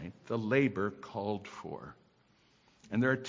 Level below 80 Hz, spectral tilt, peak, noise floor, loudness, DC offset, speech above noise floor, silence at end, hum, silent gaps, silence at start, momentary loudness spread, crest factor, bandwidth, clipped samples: -66 dBFS; -7.5 dB/octave; -14 dBFS; -68 dBFS; -34 LUFS; under 0.1%; 35 dB; 0 s; none; none; 0 s; 16 LU; 20 dB; 7.6 kHz; under 0.1%